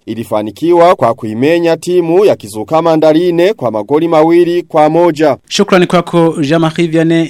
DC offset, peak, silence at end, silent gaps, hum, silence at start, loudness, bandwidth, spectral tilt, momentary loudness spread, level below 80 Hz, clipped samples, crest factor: under 0.1%; 0 dBFS; 0 s; none; none; 0.05 s; -10 LUFS; 14 kHz; -6 dB/octave; 6 LU; -52 dBFS; 0.3%; 10 dB